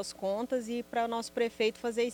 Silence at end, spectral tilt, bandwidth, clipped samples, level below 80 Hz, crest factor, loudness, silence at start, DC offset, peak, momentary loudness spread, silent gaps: 0 s; -3.5 dB/octave; 19 kHz; under 0.1%; -68 dBFS; 14 dB; -33 LUFS; 0 s; under 0.1%; -18 dBFS; 4 LU; none